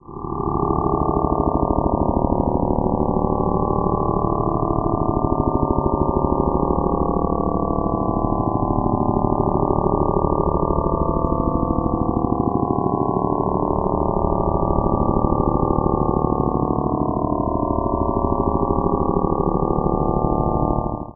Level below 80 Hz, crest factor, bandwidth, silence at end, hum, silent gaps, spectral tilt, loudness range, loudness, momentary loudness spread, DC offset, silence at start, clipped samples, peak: -30 dBFS; 18 dB; 1.3 kHz; 0.05 s; none; none; -18 dB/octave; 1 LU; -20 LUFS; 2 LU; under 0.1%; 0.1 s; under 0.1%; -2 dBFS